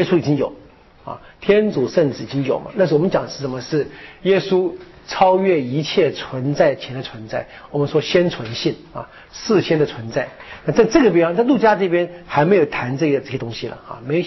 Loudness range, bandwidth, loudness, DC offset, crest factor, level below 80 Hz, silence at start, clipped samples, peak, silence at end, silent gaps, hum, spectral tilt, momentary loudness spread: 4 LU; 6.2 kHz; -18 LUFS; under 0.1%; 14 dB; -50 dBFS; 0 s; under 0.1%; -4 dBFS; 0 s; none; none; -5 dB/octave; 15 LU